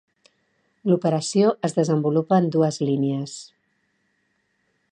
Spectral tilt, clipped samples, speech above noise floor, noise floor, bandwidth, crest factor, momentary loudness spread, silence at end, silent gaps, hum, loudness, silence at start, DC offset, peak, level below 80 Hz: -6.5 dB/octave; under 0.1%; 49 dB; -70 dBFS; 10 kHz; 18 dB; 10 LU; 1.45 s; none; none; -22 LUFS; 0.85 s; under 0.1%; -6 dBFS; -72 dBFS